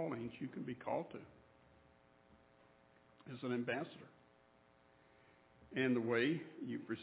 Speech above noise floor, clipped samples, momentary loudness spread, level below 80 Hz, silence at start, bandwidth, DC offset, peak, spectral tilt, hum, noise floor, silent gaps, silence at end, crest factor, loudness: 29 dB; under 0.1%; 21 LU; -78 dBFS; 0 s; 4 kHz; under 0.1%; -24 dBFS; -5 dB/octave; none; -70 dBFS; none; 0 s; 20 dB; -41 LUFS